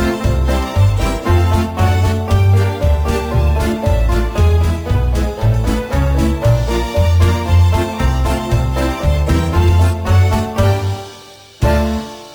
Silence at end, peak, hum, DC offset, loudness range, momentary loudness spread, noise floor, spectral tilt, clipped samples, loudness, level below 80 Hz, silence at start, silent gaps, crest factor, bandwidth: 0 s; 0 dBFS; none; under 0.1%; 1 LU; 4 LU; -38 dBFS; -7 dB/octave; under 0.1%; -15 LUFS; -18 dBFS; 0 s; none; 12 dB; over 20 kHz